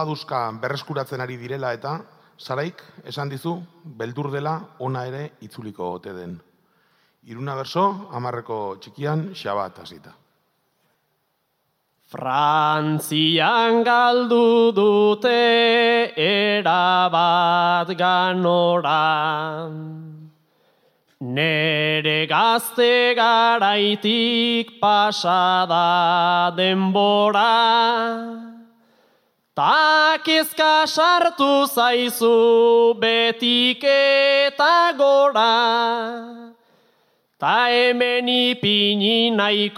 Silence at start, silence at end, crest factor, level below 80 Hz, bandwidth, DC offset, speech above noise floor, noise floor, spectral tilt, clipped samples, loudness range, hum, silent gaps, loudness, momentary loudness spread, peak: 0 s; 0 s; 16 dB; -76 dBFS; 16 kHz; under 0.1%; 52 dB; -71 dBFS; -4.5 dB/octave; under 0.1%; 14 LU; none; none; -18 LUFS; 15 LU; -4 dBFS